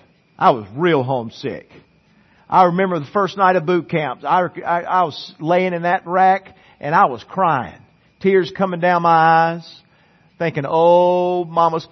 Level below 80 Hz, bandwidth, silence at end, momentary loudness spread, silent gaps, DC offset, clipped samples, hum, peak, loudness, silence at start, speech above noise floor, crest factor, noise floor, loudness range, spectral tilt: -64 dBFS; 6.4 kHz; 0.05 s; 10 LU; none; under 0.1%; under 0.1%; none; 0 dBFS; -17 LUFS; 0.4 s; 38 dB; 18 dB; -54 dBFS; 2 LU; -7.5 dB/octave